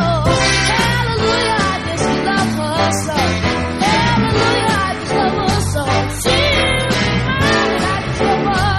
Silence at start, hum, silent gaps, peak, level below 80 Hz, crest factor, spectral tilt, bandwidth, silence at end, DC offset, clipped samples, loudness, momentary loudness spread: 0 s; none; none; -2 dBFS; -30 dBFS; 14 dB; -4.5 dB/octave; 12.5 kHz; 0 s; under 0.1%; under 0.1%; -15 LUFS; 4 LU